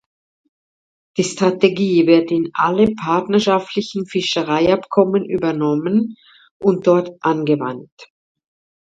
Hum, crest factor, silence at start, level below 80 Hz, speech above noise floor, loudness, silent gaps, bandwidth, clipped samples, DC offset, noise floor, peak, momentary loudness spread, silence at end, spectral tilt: none; 18 dB; 1.15 s; -56 dBFS; over 73 dB; -17 LUFS; 6.51-6.60 s, 7.92-7.97 s; 9.2 kHz; under 0.1%; under 0.1%; under -90 dBFS; 0 dBFS; 8 LU; 0.8 s; -6 dB/octave